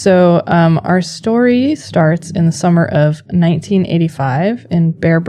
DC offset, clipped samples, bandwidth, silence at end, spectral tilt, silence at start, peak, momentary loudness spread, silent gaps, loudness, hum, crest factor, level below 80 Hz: under 0.1%; under 0.1%; 10.5 kHz; 0 s; -7.5 dB/octave; 0 s; 0 dBFS; 5 LU; none; -13 LUFS; none; 12 dB; -48 dBFS